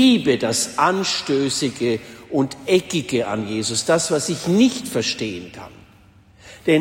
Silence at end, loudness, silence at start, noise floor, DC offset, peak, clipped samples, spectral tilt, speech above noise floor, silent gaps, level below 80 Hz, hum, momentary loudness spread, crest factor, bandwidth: 0 s; -20 LUFS; 0 s; -50 dBFS; under 0.1%; -4 dBFS; under 0.1%; -4 dB/octave; 30 dB; none; -56 dBFS; none; 9 LU; 16 dB; 16.5 kHz